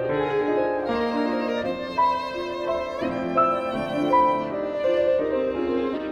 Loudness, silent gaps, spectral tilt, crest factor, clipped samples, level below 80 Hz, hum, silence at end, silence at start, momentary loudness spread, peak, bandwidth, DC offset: -24 LUFS; none; -6.5 dB/octave; 16 dB; under 0.1%; -52 dBFS; none; 0 s; 0 s; 6 LU; -8 dBFS; 11 kHz; under 0.1%